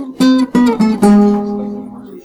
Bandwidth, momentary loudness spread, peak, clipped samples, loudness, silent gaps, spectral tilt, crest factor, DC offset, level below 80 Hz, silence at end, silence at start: 14 kHz; 16 LU; -2 dBFS; under 0.1%; -12 LUFS; none; -7 dB/octave; 10 dB; under 0.1%; -46 dBFS; 0.05 s; 0 s